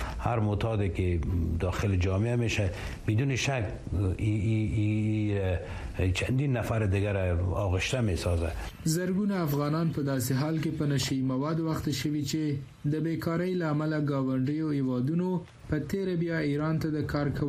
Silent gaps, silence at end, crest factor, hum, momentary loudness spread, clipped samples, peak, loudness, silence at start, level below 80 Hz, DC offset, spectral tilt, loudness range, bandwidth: none; 0 s; 16 dB; none; 4 LU; under 0.1%; -12 dBFS; -29 LUFS; 0 s; -42 dBFS; under 0.1%; -6.5 dB/octave; 1 LU; 15 kHz